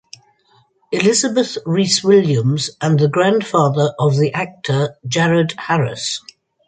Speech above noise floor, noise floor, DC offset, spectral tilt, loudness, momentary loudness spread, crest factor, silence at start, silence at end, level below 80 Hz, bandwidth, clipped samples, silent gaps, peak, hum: 41 dB; -56 dBFS; under 0.1%; -5 dB/octave; -16 LUFS; 7 LU; 16 dB; 0.9 s; 0.5 s; -58 dBFS; 9.6 kHz; under 0.1%; none; 0 dBFS; none